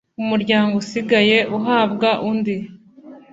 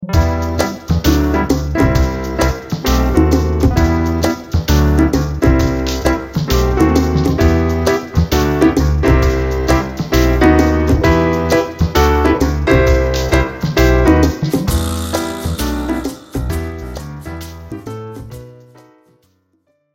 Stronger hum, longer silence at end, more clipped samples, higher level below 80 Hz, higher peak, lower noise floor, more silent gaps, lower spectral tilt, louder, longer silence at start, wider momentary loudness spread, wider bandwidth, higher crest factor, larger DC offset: neither; second, 0.15 s vs 1.4 s; neither; second, -60 dBFS vs -20 dBFS; about the same, -2 dBFS vs 0 dBFS; second, -42 dBFS vs -62 dBFS; neither; about the same, -5.5 dB/octave vs -6.5 dB/octave; second, -18 LUFS vs -14 LUFS; first, 0.2 s vs 0 s; second, 9 LU vs 12 LU; second, 7.8 kHz vs 17 kHz; about the same, 16 dB vs 14 dB; neither